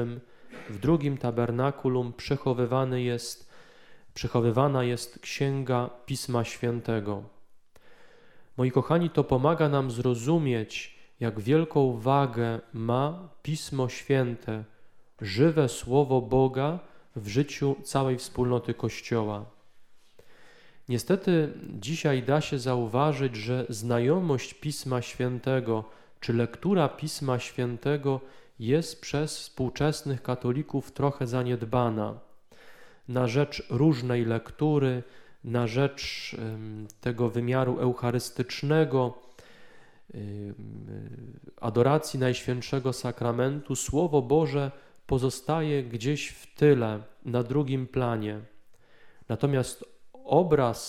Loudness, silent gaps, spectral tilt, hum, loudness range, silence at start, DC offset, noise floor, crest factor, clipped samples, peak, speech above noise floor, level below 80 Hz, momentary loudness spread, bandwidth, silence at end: -28 LUFS; none; -6.5 dB/octave; none; 4 LU; 0 s; under 0.1%; -51 dBFS; 20 dB; under 0.1%; -8 dBFS; 24 dB; -54 dBFS; 12 LU; 15 kHz; 0 s